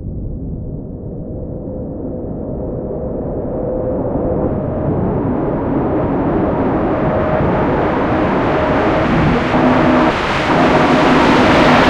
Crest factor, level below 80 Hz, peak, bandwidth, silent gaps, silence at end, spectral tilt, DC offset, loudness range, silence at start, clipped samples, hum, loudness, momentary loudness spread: 14 dB; -30 dBFS; 0 dBFS; 10.5 kHz; none; 0 s; -7 dB/octave; under 0.1%; 10 LU; 0 s; under 0.1%; none; -15 LUFS; 15 LU